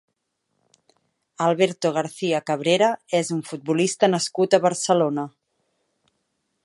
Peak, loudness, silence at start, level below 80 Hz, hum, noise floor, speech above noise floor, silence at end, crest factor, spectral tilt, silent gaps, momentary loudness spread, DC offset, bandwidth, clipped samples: -4 dBFS; -22 LUFS; 1.4 s; -74 dBFS; none; -76 dBFS; 54 dB; 1.35 s; 20 dB; -4.5 dB/octave; none; 7 LU; under 0.1%; 11.5 kHz; under 0.1%